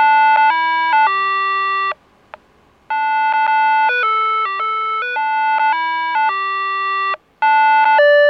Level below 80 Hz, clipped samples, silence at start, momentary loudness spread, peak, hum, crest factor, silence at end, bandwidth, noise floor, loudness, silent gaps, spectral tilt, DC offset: -66 dBFS; under 0.1%; 0 s; 8 LU; -4 dBFS; none; 12 dB; 0 s; 5.8 kHz; -52 dBFS; -15 LUFS; none; -2.5 dB/octave; under 0.1%